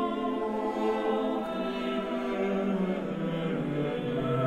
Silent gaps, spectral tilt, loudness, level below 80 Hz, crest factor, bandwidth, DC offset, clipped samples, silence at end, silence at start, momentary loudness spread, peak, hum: none; -7.5 dB/octave; -30 LUFS; -58 dBFS; 12 dB; 13 kHz; 0.1%; under 0.1%; 0 s; 0 s; 3 LU; -18 dBFS; none